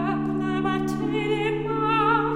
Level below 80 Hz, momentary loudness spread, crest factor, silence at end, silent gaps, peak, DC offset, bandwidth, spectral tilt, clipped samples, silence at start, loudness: -48 dBFS; 5 LU; 14 dB; 0 s; none; -10 dBFS; under 0.1%; 16 kHz; -7 dB/octave; under 0.1%; 0 s; -24 LUFS